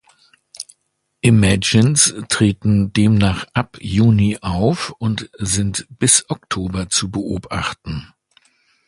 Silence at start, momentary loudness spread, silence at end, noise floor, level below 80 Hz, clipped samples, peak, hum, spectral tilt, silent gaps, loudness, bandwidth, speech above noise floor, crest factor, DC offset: 0.6 s; 11 LU; 0.85 s; -70 dBFS; -38 dBFS; under 0.1%; 0 dBFS; none; -4.5 dB/octave; none; -17 LUFS; 11.5 kHz; 53 dB; 18 dB; under 0.1%